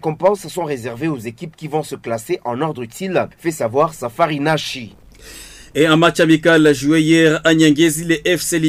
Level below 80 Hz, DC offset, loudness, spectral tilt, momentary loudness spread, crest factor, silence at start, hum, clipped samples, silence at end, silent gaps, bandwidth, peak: -50 dBFS; under 0.1%; -16 LUFS; -5 dB/octave; 14 LU; 14 dB; 0.05 s; none; under 0.1%; 0 s; none; 16 kHz; -2 dBFS